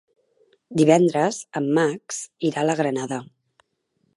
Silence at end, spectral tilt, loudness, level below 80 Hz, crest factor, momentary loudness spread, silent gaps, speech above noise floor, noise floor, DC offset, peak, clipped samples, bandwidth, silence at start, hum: 0.9 s; -5.5 dB/octave; -22 LUFS; -72 dBFS; 20 dB; 14 LU; none; 50 dB; -71 dBFS; under 0.1%; -2 dBFS; under 0.1%; 11.5 kHz; 0.7 s; none